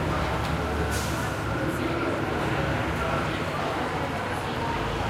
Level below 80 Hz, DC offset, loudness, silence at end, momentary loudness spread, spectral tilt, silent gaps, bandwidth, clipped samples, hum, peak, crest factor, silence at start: -38 dBFS; under 0.1%; -28 LUFS; 0 s; 2 LU; -5.5 dB/octave; none; 16 kHz; under 0.1%; none; -14 dBFS; 14 dB; 0 s